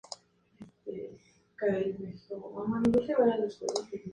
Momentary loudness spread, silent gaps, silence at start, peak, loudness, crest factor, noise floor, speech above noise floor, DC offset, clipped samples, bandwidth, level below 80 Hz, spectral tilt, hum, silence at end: 19 LU; none; 0.1 s; -14 dBFS; -31 LUFS; 18 dB; -56 dBFS; 26 dB; under 0.1%; under 0.1%; 10.5 kHz; -62 dBFS; -6 dB/octave; none; 0 s